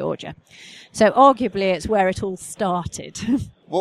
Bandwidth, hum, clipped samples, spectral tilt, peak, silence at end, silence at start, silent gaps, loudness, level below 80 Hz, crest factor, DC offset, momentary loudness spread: 13.5 kHz; none; under 0.1%; -5 dB/octave; -2 dBFS; 0 s; 0 s; none; -20 LUFS; -46 dBFS; 20 dB; under 0.1%; 17 LU